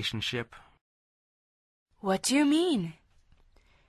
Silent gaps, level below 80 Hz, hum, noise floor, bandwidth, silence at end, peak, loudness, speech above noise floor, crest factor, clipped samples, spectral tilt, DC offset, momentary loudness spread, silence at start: 0.81-1.86 s; -64 dBFS; none; -62 dBFS; 13.5 kHz; 0.95 s; -14 dBFS; -28 LUFS; 34 dB; 18 dB; under 0.1%; -4 dB/octave; under 0.1%; 14 LU; 0 s